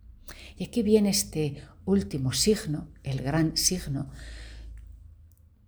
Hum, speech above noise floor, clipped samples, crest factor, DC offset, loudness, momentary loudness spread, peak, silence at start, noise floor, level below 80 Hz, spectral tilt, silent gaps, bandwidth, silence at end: none; 28 dB; under 0.1%; 20 dB; under 0.1%; -27 LUFS; 22 LU; -10 dBFS; 0.05 s; -55 dBFS; -46 dBFS; -4.5 dB/octave; none; over 20 kHz; 0.4 s